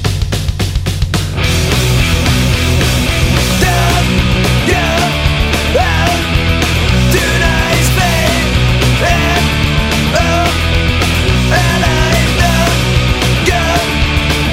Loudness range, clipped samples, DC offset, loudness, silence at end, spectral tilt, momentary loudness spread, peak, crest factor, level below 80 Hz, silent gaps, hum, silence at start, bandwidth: 1 LU; under 0.1%; under 0.1%; -11 LUFS; 0 s; -4.5 dB/octave; 2 LU; 0 dBFS; 12 dB; -18 dBFS; none; none; 0 s; 16.5 kHz